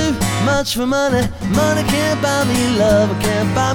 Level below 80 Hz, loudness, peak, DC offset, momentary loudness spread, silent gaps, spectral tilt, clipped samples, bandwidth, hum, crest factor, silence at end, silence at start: -34 dBFS; -16 LUFS; -2 dBFS; under 0.1%; 4 LU; none; -5 dB/octave; under 0.1%; over 20 kHz; none; 14 dB; 0 s; 0 s